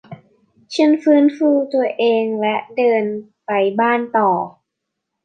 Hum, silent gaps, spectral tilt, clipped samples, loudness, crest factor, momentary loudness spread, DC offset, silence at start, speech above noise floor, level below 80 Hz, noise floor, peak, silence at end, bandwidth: none; none; -6 dB/octave; under 0.1%; -17 LUFS; 14 dB; 9 LU; under 0.1%; 0.1 s; 62 dB; -72 dBFS; -78 dBFS; -2 dBFS; 0.75 s; 8.8 kHz